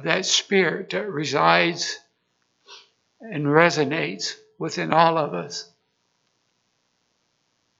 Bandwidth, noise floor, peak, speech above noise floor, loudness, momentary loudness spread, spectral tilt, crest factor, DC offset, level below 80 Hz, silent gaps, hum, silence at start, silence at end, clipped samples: 8 kHz; -71 dBFS; 0 dBFS; 49 dB; -21 LUFS; 14 LU; -3.5 dB/octave; 24 dB; under 0.1%; -78 dBFS; none; none; 0 s; 2.15 s; under 0.1%